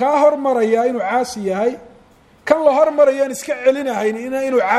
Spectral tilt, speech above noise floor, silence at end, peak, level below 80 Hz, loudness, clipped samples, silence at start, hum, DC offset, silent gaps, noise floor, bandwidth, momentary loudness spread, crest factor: -4.5 dB/octave; 33 dB; 0 s; 0 dBFS; -58 dBFS; -17 LUFS; under 0.1%; 0 s; none; under 0.1%; none; -49 dBFS; 14 kHz; 8 LU; 16 dB